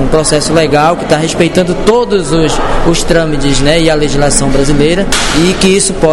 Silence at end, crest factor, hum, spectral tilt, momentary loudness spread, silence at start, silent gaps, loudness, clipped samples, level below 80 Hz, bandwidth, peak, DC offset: 0 s; 8 dB; none; -4 dB/octave; 3 LU; 0 s; none; -9 LUFS; 0.2%; -18 dBFS; 12 kHz; 0 dBFS; 0.8%